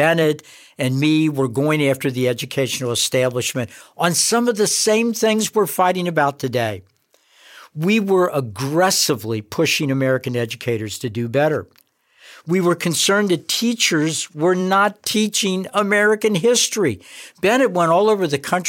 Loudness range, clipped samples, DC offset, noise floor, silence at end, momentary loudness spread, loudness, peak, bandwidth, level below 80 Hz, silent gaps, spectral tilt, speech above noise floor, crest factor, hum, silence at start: 3 LU; under 0.1%; under 0.1%; -56 dBFS; 0 s; 8 LU; -18 LUFS; -4 dBFS; 17 kHz; -66 dBFS; none; -4 dB/octave; 38 dB; 16 dB; none; 0 s